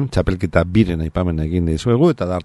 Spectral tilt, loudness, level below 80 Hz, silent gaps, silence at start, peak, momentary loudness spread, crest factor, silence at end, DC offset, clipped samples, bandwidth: -8 dB/octave; -18 LUFS; -30 dBFS; none; 0 s; -2 dBFS; 5 LU; 16 dB; 0 s; under 0.1%; under 0.1%; 12 kHz